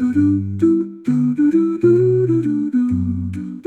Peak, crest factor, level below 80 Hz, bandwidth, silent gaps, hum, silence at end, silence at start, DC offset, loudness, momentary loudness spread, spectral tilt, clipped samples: -4 dBFS; 12 dB; -56 dBFS; 8.2 kHz; none; none; 0.05 s; 0 s; under 0.1%; -17 LUFS; 6 LU; -10.5 dB/octave; under 0.1%